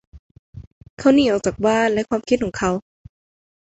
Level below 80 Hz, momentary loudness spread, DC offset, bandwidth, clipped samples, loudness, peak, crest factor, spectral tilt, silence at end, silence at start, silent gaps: -48 dBFS; 7 LU; under 0.1%; 8.2 kHz; under 0.1%; -19 LUFS; -4 dBFS; 18 dB; -5 dB/octave; 0.9 s; 0.15 s; 0.19-0.53 s, 0.67-0.81 s, 0.90-0.97 s